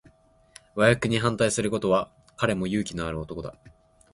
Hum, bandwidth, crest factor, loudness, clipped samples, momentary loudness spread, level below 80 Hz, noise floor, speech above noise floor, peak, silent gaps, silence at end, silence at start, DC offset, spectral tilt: none; 11.5 kHz; 24 dB; -25 LUFS; under 0.1%; 16 LU; -50 dBFS; -58 dBFS; 33 dB; -4 dBFS; none; 0.45 s; 0.75 s; under 0.1%; -5 dB/octave